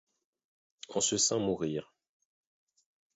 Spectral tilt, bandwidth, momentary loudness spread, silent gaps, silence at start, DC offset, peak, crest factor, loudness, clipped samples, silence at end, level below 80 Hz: -3 dB/octave; 8 kHz; 11 LU; none; 0.9 s; under 0.1%; -16 dBFS; 20 dB; -31 LUFS; under 0.1%; 1.3 s; -68 dBFS